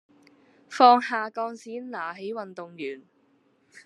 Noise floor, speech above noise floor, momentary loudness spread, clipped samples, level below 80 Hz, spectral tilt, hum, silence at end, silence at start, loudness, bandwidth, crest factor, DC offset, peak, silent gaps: -65 dBFS; 40 dB; 21 LU; under 0.1%; under -90 dBFS; -4 dB/octave; none; 0.05 s; 0.7 s; -24 LUFS; 10 kHz; 24 dB; under 0.1%; -2 dBFS; none